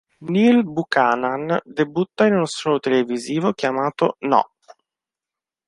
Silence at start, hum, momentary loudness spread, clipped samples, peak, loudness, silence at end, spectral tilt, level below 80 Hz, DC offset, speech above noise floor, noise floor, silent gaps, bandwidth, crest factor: 0.2 s; none; 7 LU; under 0.1%; -2 dBFS; -20 LUFS; 1.2 s; -6 dB/octave; -64 dBFS; under 0.1%; 70 dB; -89 dBFS; none; 11.5 kHz; 18 dB